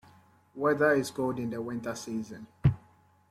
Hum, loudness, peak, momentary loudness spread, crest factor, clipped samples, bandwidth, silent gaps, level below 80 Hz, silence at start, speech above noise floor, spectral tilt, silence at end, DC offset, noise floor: none; -30 LUFS; -12 dBFS; 15 LU; 20 dB; under 0.1%; 15.5 kHz; none; -52 dBFS; 0.55 s; 32 dB; -6.5 dB/octave; 0.5 s; under 0.1%; -62 dBFS